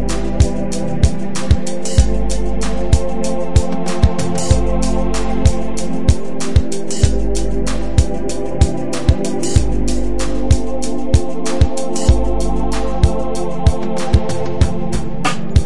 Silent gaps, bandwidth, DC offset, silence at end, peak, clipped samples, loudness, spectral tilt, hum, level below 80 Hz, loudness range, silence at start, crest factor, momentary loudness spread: none; 11.5 kHz; 20%; 0 s; 0 dBFS; under 0.1%; -18 LUFS; -6 dB/octave; none; -20 dBFS; 1 LU; 0 s; 18 dB; 5 LU